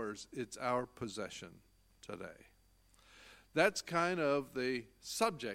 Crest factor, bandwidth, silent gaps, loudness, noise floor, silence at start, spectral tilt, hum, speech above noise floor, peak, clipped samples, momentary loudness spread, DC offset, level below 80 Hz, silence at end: 24 dB; 16.5 kHz; none; -37 LUFS; -68 dBFS; 0 s; -4 dB/octave; none; 31 dB; -14 dBFS; under 0.1%; 19 LU; under 0.1%; -70 dBFS; 0 s